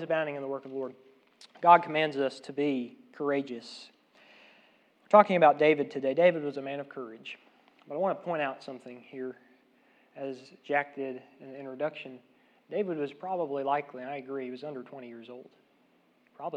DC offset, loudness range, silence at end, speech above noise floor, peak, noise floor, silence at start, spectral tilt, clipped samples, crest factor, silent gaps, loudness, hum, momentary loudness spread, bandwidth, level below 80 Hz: under 0.1%; 11 LU; 0 s; 37 dB; -4 dBFS; -67 dBFS; 0 s; -6.5 dB/octave; under 0.1%; 26 dB; none; -29 LUFS; none; 23 LU; 9.4 kHz; under -90 dBFS